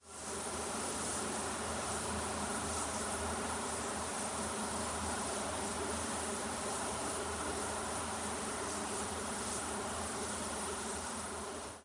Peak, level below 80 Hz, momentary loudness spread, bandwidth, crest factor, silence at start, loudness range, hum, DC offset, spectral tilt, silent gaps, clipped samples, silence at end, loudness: -24 dBFS; -58 dBFS; 2 LU; 11.5 kHz; 14 dB; 0.05 s; 1 LU; none; under 0.1%; -2.5 dB/octave; none; under 0.1%; 0 s; -38 LUFS